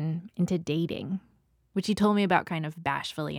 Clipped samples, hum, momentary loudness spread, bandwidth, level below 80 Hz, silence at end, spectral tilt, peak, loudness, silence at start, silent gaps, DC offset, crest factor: under 0.1%; none; 10 LU; 14.5 kHz; -60 dBFS; 0 s; -6.5 dB/octave; -8 dBFS; -29 LUFS; 0 s; none; under 0.1%; 20 dB